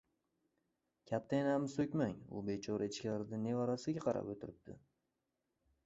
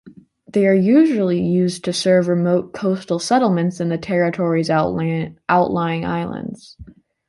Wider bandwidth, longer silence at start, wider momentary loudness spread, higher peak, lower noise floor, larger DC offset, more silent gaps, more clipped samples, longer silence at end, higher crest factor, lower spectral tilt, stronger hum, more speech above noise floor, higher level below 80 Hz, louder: second, 8 kHz vs 11.5 kHz; first, 1.1 s vs 0.05 s; about the same, 11 LU vs 9 LU; second, -22 dBFS vs -2 dBFS; first, -87 dBFS vs -44 dBFS; neither; neither; neither; first, 1.05 s vs 0.4 s; about the same, 18 dB vs 16 dB; about the same, -6.5 dB/octave vs -6.5 dB/octave; neither; first, 48 dB vs 26 dB; second, -72 dBFS vs -52 dBFS; second, -40 LUFS vs -18 LUFS